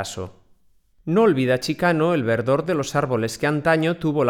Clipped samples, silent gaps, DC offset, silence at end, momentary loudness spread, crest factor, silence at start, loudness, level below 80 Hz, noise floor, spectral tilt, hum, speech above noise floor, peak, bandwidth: under 0.1%; none; under 0.1%; 0 s; 10 LU; 16 dB; 0 s; -21 LUFS; -54 dBFS; -57 dBFS; -6 dB/octave; none; 37 dB; -6 dBFS; 18 kHz